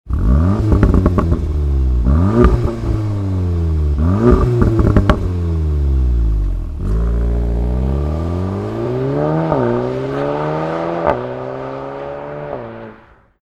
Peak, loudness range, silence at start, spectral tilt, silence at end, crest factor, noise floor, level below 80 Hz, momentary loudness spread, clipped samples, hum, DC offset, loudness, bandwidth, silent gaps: 0 dBFS; 5 LU; 0.05 s; -9.5 dB/octave; 0.5 s; 16 dB; -44 dBFS; -18 dBFS; 13 LU; under 0.1%; none; under 0.1%; -17 LUFS; 7.4 kHz; none